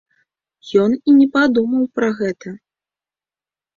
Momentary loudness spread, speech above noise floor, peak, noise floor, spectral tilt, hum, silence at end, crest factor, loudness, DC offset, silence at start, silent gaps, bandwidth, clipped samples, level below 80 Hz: 11 LU; over 75 dB; -2 dBFS; under -90 dBFS; -6.5 dB/octave; none; 1.2 s; 16 dB; -16 LUFS; under 0.1%; 0.65 s; none; 7.2 kHz; under 0.1%; -60 dBFS